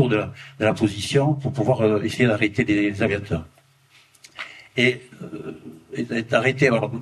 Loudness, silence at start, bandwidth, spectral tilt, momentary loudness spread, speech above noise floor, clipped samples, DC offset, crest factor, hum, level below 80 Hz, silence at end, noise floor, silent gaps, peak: -21 LUFS; 0 s; 12.5 kHz; -6 dB/octave; 16 LU; 34 dB; under 0.1%; under 0.1%; 20 dB; none; -54 dBFS; 0 s; -56 dBFS; none; -4 dBFS